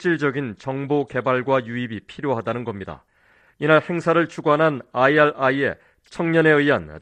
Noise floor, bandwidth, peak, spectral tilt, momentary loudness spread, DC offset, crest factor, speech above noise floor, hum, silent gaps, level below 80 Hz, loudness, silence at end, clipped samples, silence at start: -58 dBFS; 9.4 kHz; -2 dBFS; -7 dB/octave; 13 LU; under 0.1%; 18 dB; 37 dB; none; none; -56 dBFS; -20 LUFS; 0 s; under 0.1%; 0 s